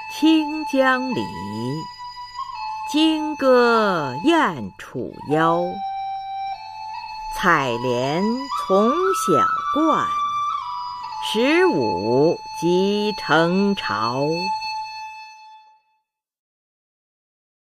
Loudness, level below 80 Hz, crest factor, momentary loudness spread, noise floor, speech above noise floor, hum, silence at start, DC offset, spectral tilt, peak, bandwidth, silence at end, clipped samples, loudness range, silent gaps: -20 LUFS; -54 dBFS; 18 dB; 14 LU; -72 dBFS; 53 dB; none; 0 s; under 0.1%; -5 dB/octave; -2 dBFS; 15.5 kHz; 2.15 s; under 0.1%; 5 LU; none